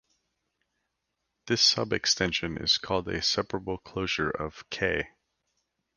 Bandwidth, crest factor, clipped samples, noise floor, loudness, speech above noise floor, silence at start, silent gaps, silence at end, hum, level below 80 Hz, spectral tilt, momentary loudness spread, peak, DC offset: 11 kHz; 22 dB; under 0.1%; -82 dBFS; -27 LUFS; 53 dB; 1.45 s; none; 0.9 s; none; -52 dBFS; -2.5 dB/octave; 13 LU; -10 dBFS; under 0.1%